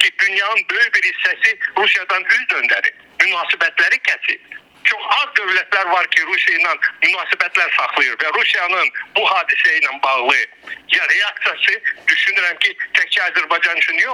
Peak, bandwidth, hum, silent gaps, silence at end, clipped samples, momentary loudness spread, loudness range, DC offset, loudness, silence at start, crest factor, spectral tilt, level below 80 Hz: 0 dBFS; 12.5 kHz; none; none; 0 s; under 0.1%; 3 LU; 1 LU; under 0.1%; -15 LUFS; 0 s; 16 dB; 0.5 dB/octave; -68 dBFS